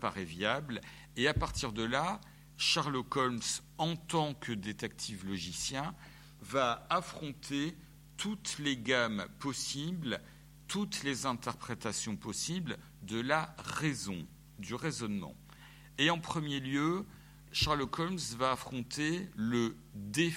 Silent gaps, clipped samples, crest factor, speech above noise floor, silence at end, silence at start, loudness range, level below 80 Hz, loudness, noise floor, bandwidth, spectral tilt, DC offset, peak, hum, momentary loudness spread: none; under 0.1%; 24 dB; 19 dB; 0 s; 0 s; 4 LU; -56 dBFS; -35 LUFS; -55 dBFS; 16.5 kHz; -4 dB/octave; under 0.1%; -14 dBFS; none; 13 LU